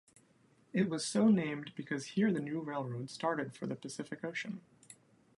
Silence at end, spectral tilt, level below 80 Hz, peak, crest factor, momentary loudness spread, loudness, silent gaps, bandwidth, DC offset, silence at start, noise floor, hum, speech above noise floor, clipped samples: 0.45 s; -5.5 dB/octave; -78 dBFS; -18 dBFS; 18 dB; 13 LU; -36 LUFS; none; 11.5 kHz; under 0.1%; 0.75 s; -68 dBFS; none; 33 dB; under 0.1%